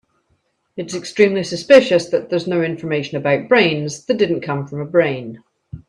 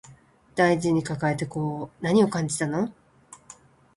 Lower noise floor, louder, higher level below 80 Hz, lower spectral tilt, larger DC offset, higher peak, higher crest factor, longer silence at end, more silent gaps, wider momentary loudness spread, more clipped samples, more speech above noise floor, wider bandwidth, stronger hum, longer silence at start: first, -65 dBFS vs -54 dBFS; first, -17 LUFS vs -25 LUFS; about the same, -58 dBFS vs -58 dBFS; about the same, -5.5 dB/octave vs -6 dB/octave; neither; first, 0 dBFS vs -6 dBFS; about the same, 18 dB vs 20 dB; second, 0.1 s vs 0.45 s; neither; first, 15 LU vs 11 LU; neither; first, 48 dB vs 30 dB; about the same, 11 kHz vs 11.5 kHz; neither; first, 0.75 s vs 0.1 s